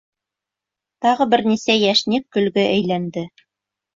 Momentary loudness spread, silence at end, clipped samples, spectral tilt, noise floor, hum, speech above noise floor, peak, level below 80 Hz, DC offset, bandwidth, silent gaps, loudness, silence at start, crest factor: 10 LU; 0.7 s; under 0.1%; -5 dB/octave; -86 dBFS; none; 68 dB; -4 dBFS; -60 dBFS; under 0.1%; 7.6 kHz; none; -18 LUFS; 1 s; 16 dB